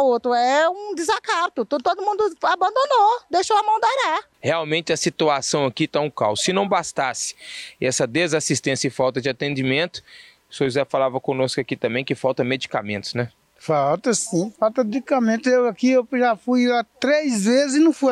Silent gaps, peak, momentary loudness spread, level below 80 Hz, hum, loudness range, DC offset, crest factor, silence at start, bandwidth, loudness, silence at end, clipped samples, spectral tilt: none; -6 dBFS; 7 LU; -64 dBFS; none; 4 LU; under 0.1%; 14 dB; 0 s; 13 kHz; -21 LUFS; 0 s; under 0.1%; -4 dB/octave